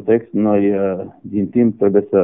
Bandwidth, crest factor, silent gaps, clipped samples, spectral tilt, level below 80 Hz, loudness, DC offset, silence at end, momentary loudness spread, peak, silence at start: 3.6 kHz; 14 dB; none; under 0.1%; -6.5 dB/octave; -56 dBFS; -17 LUFS; under 0.1%; 0 s; 9 LU; -2 dBFS; 0 s